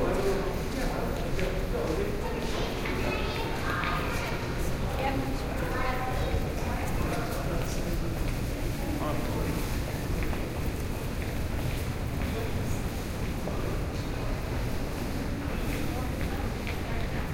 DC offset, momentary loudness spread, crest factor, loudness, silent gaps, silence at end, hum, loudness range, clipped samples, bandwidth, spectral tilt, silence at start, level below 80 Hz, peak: under 0.1%; 3 LU; 14 dB; -32 LUFS; none; 0 s; none; 2 LU; under 0.1%; 16.5 kHz; -5.5 dB/octave; 0 s; -34 dBFS; -16 dBFS